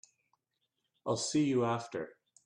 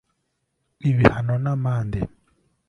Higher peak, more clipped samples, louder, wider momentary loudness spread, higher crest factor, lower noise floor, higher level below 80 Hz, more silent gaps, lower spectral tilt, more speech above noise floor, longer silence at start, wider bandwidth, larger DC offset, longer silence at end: second, -20 dBFS vs 0 dBFS; neither; second, -33 LUFS vs -22 LUFS; about the same, 13 LU vs 11 LU; second, 16 dB vs 24 dB; first, -84 dBFS vs -74 dBFS; second, -74 dBFS vs -42 dBFS; neither; second, -5 dB/octave vs -9 dB/octave; about the same, 51 dB vs 54 dB; first, 1.05 s vs 0.85 s; first, 11 kHz vs 6.8 kHz; neither; second, 0.35 s vs 0.6 s